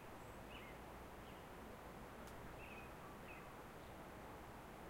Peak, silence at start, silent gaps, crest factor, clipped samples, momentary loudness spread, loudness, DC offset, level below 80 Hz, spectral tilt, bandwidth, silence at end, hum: -42 dBFS; 0 s; none; 14 dB; under 0.1%; 2 LU; -56 LUFS; under 0.1%; -64 dBFS; -5 dB/octave; 16 kHz; 0 s; none